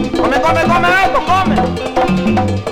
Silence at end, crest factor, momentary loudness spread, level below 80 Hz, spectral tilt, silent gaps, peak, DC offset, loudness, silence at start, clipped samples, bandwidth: 0 s; 10 dB; 5 LU; -30 dBFS; -6 dB/octave; none; -2 dBFS; under 0.1%; -13 LUFS; 0 s; under 0.1%; 16 kHz